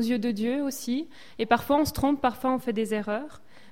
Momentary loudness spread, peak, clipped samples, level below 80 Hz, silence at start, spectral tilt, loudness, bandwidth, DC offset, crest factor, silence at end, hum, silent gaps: 10 LU; -8 dBFS; under 0.1%; -50 dBFS; 0 s; -5 dB/octave; -27 LUFS; 16.5 kHz; 0.5%; 20 dB; 0.35 s; none; none